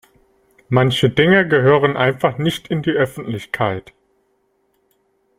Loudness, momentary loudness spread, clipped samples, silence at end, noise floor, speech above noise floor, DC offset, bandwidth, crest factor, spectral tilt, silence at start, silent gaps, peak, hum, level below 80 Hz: -17 LUFS; 9 LU; under 0.1%; 1.6 s; -64 dBFS; 48 dB; under 0.1%; 15.5 kHz; 18 dB; -6.5 dB/octave; 0.7 s; none; -2 dBFS; none; -52 dBFS